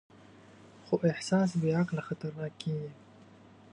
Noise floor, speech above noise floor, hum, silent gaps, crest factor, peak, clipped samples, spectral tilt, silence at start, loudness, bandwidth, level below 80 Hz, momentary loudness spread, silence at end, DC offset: -56 dBFS; 25 dB; none; none; 18 dB; -14 dBFS; under 0.1%; -7 dB/octave; 0.65 s; -32 LUFS; 10.5 kHz; -72 dBFS; 10 LU; 0.8 s; under 0.1%